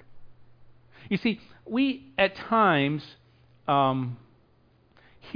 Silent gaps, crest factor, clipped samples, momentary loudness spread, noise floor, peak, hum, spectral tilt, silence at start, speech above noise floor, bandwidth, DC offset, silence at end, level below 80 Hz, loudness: none; 20 dB; under 0.1%; 15 LU; -62 dBFS; -10 dBFS; none; -8 dB/octave; 0.1 s; 36 dB; 5.2 kHz; under 0.1%; 0 s; -62 dBFS; -26 LUFS